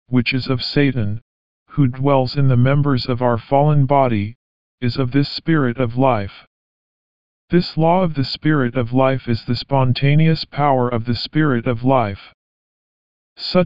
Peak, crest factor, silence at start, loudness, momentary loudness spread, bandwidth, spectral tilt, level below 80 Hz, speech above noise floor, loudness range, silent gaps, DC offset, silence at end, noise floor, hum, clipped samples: -2 dBFS; 16 dB; 0.05 s; -18 LUFS; 8 LU; 7.4 kHz; -6 dB/octave; -46 dBFS; over 73 dB; 3 LU; 1.22-1.66 s, 4.35-4.78 s, 6.47-7.48 s, 12.34-13.36 s; 3%; 0 s; under -90 dBFS; none; under 0.1%